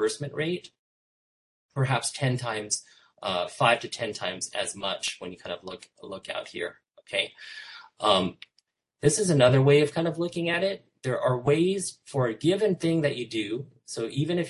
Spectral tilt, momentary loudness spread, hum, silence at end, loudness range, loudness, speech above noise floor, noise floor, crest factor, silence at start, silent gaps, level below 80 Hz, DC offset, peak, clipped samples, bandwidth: -4.5 dB/octave; 15 LU; none; 0 s; 9 LU; -27 LUFS; 44 dB; -71 dBFS; 22 dB; 0 s; 0.79-1.69 s; -64 dBFS; under 0.1%; -6 dBFS; under 0.1%; 11.5 kHz